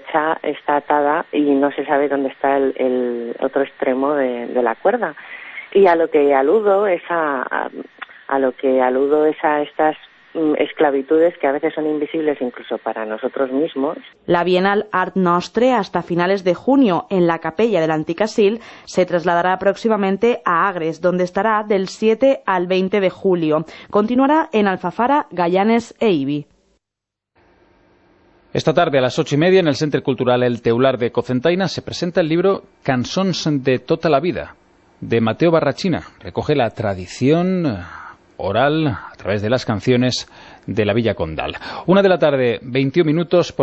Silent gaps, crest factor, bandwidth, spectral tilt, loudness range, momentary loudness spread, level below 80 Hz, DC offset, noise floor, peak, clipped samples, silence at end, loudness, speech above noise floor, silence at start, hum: none; 16 dB; 8.4 kHz; -6.5 dB/octave; 3 LU; 9 LU; -52 dBFS; under 0.1%; -83 dBFS; -2 dBFS; under 0.1%; 0 s; -18 LUFS; 66 dB; 0.05 s; none